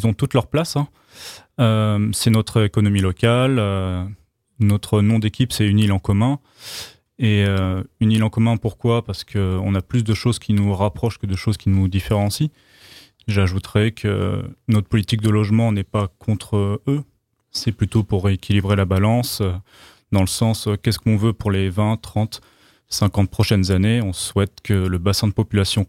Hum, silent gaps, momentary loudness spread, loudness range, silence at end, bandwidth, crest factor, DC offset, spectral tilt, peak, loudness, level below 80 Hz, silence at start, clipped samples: none; none; 8 LU; 2 LU; 0.05 s; 15.5 kHz; 18 dB; under 0.1%; -6 dB/octave; -2 dBFS; -20 LUFS; -42 dBFS; 0 s; under 0.1%